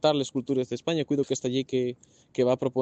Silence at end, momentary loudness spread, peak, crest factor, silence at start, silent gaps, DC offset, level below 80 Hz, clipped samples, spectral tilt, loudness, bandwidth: 0 s; 7 LU; -8 dBFS; 18 dB; 0.05 s; none; under 0.1%; -68 dBFS; under 0.1%; -5.5 dB/octave; -28 LUFS; 8.6 kHz